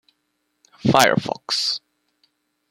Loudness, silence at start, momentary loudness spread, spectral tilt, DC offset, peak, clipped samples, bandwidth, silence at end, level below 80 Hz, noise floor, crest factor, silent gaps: -19 LUFS; 0.85 s; 9 LU; -3.5 dB/octave; under 0.1%; 0 dBFS; under 0.1%; 16.5 kHz; 0.9 s; -60 dBFS; -73 dBFS; 22 dB; none